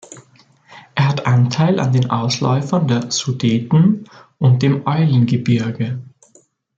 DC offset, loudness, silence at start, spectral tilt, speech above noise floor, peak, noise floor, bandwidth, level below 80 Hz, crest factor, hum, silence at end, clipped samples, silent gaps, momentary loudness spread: under 0.1%; -17 LUFS; 0.1 s; -6.5 dB/octave; 39 dB; -2 dBFS; -54 dBFS; 7.8 kHz; -56 dBFS; 14 dB; none; 0.75 s; under 0.1%; none; 7 LU